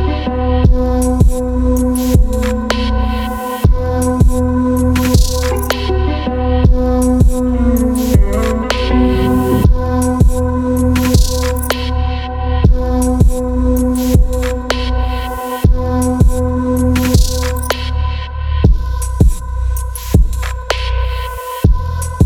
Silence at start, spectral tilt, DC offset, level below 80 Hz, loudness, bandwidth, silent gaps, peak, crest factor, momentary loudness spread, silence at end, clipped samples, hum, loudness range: 0 s; -6.5 dB/octave; under 0.1%; -16 dBFS; -15 LUFS; 18 kHz; none; 0 dBFS; 12 dB; 6 LU; 0 s; under 0.1%; none; 3 LU